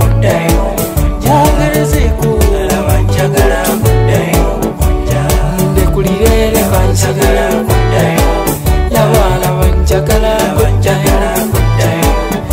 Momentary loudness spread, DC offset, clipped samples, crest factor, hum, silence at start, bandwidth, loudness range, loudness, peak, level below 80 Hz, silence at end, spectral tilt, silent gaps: 3 LU; under 0.1%; under 0.1%; 10 dB; none; 0 s; 16.5 kHz; 1 LU; -11 LUFS; 0 dBFS; -14 dBFS; 0 s; -5.5 dB/octave; none